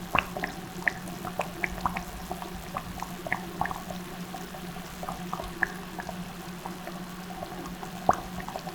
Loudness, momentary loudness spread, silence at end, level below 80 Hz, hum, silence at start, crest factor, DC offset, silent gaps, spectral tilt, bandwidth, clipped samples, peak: -34 LUFS; 10 LU; 0 s; -50 dBFS; none; 0 s; 32 dB; under 0.1%; none; -4.5 dB/octave; over 20 kHz; under 0.1%; -2 dBFS